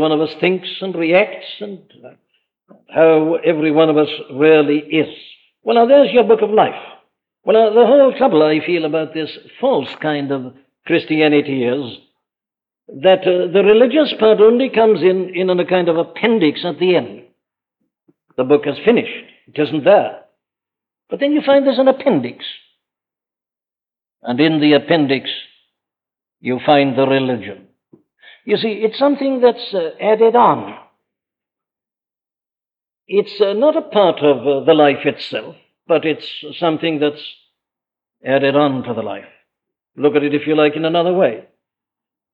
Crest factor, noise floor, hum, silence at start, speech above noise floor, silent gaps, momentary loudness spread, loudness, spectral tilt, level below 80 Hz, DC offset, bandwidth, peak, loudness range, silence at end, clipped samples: 14 dB; under -90 dBFS; none; 0 s; over 76 dB; none; 15 LU; -15 LUFS; -8.5 dB/octave; -66 dBFS; under 0.1%; 5.2 kHz; -2 dBFS; 6 LU; 0.95 s; under 0.1%